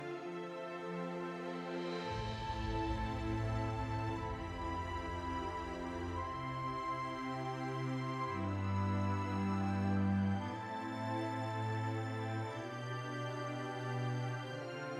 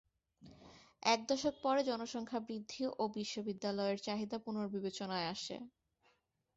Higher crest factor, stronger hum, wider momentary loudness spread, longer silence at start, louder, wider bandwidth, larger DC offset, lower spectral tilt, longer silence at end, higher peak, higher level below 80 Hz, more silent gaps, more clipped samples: second, 14 dB vs 22 dB; neither; second, 6 LU vs 9 LU; second, 0 s vs 0.4 s; about the same, -40 LUFS vs -39 LUFS; first, 11 kHz vs 8 kHz; neither; first, -7 dB/octave vs -3 dB/octave; second, 0 s vs 0.9 s; second, -24 dBFS vs -18 dBFS; first, -52 dBFS vs -76 dBFS; neither; neither